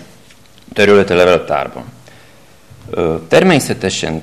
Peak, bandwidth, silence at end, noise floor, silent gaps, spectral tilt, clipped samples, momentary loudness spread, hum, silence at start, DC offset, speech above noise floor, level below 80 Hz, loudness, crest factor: 0 dBFS; 14 kHz; 0 s; -44 dBFS; none; -5 dB/octave; under 0.1%; 15 LU; none; 0 s; 0.5%; 32 dB; -44 dBFS; -12 LUFS; 14 dB